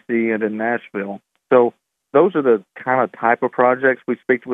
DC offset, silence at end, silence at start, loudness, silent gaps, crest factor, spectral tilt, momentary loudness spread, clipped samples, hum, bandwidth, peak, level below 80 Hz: under 0.1%; 0 s; 0.1 s; -18 LUFS; none; 18 dB; -9 dB/octave; 9 LU; under 0.1%; none; 3.8 kHz; 0 dBFS; -76 dBFS